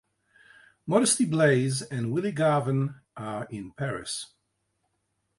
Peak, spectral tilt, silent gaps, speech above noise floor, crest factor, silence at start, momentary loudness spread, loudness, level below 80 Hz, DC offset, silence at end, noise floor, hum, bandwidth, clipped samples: -8 dBFS; -5 dB/octave; none; 51 dB; 20 dB; 0.85 s; 15 LU; -26 LUFS; -66 dBFS; under 0.1%; 1.15 s; -77 dBFS; none; 11.5 kHz; under 0.1%